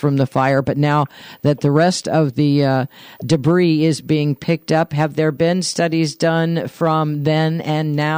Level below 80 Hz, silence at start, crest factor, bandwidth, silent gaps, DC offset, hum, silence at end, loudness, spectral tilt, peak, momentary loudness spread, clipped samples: -56 dBFS; 0 s; 12 dB; 16 kHz; none; under 0.1%; none; 0 s; -17 LUFS; -6.5 dB/octave; -4 dBFS; 5 LU; under 0.1%